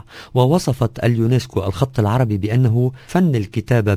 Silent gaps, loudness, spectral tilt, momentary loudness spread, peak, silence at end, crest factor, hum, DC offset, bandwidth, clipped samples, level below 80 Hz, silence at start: none; -18 LUFS; -7.5 dB/octave; 5 LU; -2 dBFS; 0 s; 16 dB; none; under 0.1%; 15.5 kHz; under 0.1%; -40 dBFS; 0.15 s